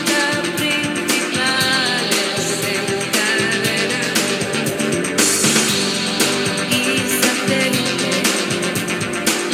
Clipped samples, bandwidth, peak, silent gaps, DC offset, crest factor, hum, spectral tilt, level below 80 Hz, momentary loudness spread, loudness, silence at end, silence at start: under 0.1%; 19 kHz; 0 dBFS; none; under 0.1%; 18 dB; none; -2.5 dB/octave; -56 dBFS; 4 LU; -17 LUFS; 0 s; 0 s